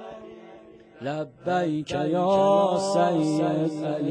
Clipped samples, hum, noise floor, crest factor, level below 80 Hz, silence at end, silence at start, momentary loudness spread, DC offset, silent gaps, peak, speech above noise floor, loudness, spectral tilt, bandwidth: under 0.1%; none; -48 dBFS; 16 dB; -64 dBFS; 0 s; 0 s; 15 LU; under 0.1%; none; -10 dBFS; 25 dB; -24 LUFS; -6.5 dB/octave; 10 kHz